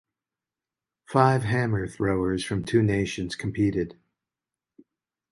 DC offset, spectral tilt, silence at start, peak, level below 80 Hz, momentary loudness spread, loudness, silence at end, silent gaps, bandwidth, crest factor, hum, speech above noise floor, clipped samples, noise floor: under 0.1%; -6.5 dB/octave; 1.1 s; -4 dBFS; -50 dBFS; 9 LU; -25 LUFS; 1.4 s; none; 11.5 kHz; 24 dB; none; 66 dB; under 0.1%; -90 dBFS